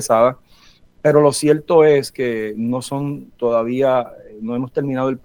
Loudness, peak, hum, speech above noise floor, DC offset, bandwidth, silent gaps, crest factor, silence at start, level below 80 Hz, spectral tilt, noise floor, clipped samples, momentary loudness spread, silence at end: -17 LUFS; -2 dBFS; none; 32 dB; under 0.1%; 18.5 kHz; none; 16 dB; 0 s; -56 dBFS; -5.5 dB/octave; -49 dBFS; under 0.1%; 12 LU; 0.05 s